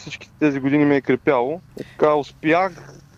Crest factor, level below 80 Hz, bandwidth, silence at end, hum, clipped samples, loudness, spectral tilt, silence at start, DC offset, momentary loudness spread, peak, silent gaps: 16 dB; -56 dBFS; 7.6 kHz; 0.25 s; none; under 0.1%; -19 LUFS; -7 dB/octave; 0 s; under 0.1%; 11 LU; -4 dBFS; none